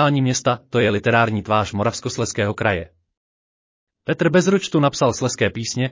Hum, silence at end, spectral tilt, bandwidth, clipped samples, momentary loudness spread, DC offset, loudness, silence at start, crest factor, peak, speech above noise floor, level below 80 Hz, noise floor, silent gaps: none; 0 s; -5 dB/octave; 7.6 kHz; under 0.1%; 7 LU; under 0.1%; -19 LUFS; 0 s; 16 dB; -4 dBFS; over 71 dB; -46 dBFS; under -90 dBFS; 3.17-3.87 s